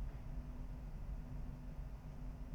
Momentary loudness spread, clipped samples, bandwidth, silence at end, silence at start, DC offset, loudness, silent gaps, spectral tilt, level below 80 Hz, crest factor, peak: 2 LU; under 0.1%; 7.6 kHz; 0 s; 0 s; under 0.1%; -51 LUFS; none; -8 dB/octave; -48 dBFS; 10 dB; -36 dBFS